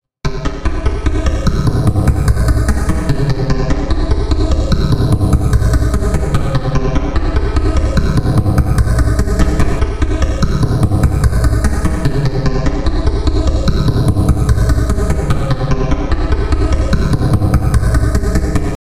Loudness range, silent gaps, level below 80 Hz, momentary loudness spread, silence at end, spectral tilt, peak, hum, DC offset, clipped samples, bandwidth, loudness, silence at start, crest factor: 1 LU; none; -16 dBFS; 4 LU; 0.05 s; -7 dB/octave; 0 dBFS; none; 2%; under 0.1%; 15 kHz; -15 LUFS; 0 s; 12 dB